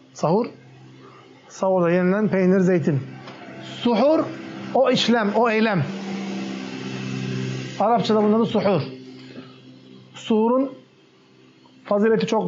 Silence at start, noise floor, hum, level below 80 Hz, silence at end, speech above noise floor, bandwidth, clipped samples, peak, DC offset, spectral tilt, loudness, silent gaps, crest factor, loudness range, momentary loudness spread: 0.15 s; -54 dBFS; none; -72 dBFS; 0 s; 34 dB; 7.6 kHz; under 0.1%; -8 dBFS; under 0.1%; -5 dB/octave; -21 LUFS; none; 14 dB; 4 LU; 19 LU